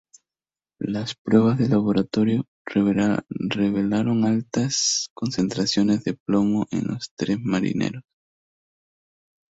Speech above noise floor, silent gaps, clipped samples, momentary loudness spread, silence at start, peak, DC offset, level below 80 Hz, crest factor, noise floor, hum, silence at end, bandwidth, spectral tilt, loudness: over 68 dB; 1.18-1.25 s, 2.48-2.65 s, 5.10-5.16 s, 6.20-6.26 s, 7.11-7.17 s; under 0.1%; 8 LU; 0.8 s; -4 dBFS; under 0.1%; -56 dBFS; 20 dB; under -90 dBFS; none; 1.5 s; 8 kHz; -5 dB/octave; -23 LUFS